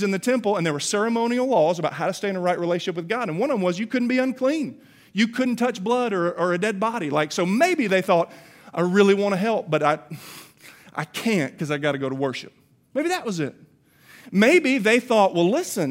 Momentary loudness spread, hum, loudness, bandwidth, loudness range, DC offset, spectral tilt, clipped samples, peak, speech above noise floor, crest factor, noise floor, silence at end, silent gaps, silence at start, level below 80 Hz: 11 LU; none; -22 LUFS; 16 kHz; 5 LU; under 0.1%; -5 dB/octave; under 0.1%; -4 dBFS; 31 dB; 18 dB; -53 dBFS; 0 s; none; 0 s; -74 dBFS